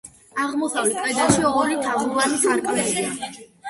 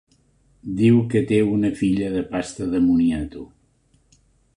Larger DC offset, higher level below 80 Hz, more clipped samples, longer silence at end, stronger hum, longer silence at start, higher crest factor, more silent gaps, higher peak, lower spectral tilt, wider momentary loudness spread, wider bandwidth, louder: neither; second, -54 dBFS vs -46 dBFS; neither; second, 0 s vs 1.1 s; neither; second, 0.05 s vs 0.65 s; about the same, 20 dB vs 16 dB; neither; first, -2 dBFS vs -6 dBFS; second, -3 dB/octave vs -7.5 dB/octave; second, 9 LU vs 14 LU; about the same, 12 kHz vs 11 kHz; about the same, -21 LUFS vs -20 LUFS